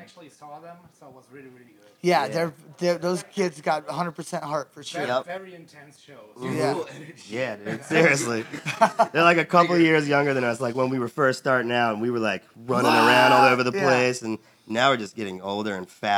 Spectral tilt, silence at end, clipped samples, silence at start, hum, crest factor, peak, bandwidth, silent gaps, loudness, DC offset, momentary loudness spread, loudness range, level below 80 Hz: -4.5 dB/octave; 0 s; under 0.1%; 0 s; none; 20 dB; -4 dBFS; 18.5 kHz; none; -22 LUFS; under 0.1%; 15 LU; 10 LU; -78 dBFS